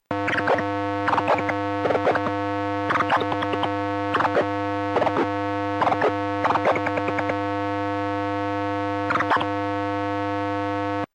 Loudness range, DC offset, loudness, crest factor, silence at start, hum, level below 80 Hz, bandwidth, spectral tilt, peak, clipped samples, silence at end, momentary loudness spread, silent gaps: 2 LU; under 0.1%; -24 LUFS; 16 dB; 0.1 s; none; -62 dBFS; 9.8 kHz; -6.5 dB/octave; -8 dBFS; under 0.1%; 0.1 s; 4 LU; none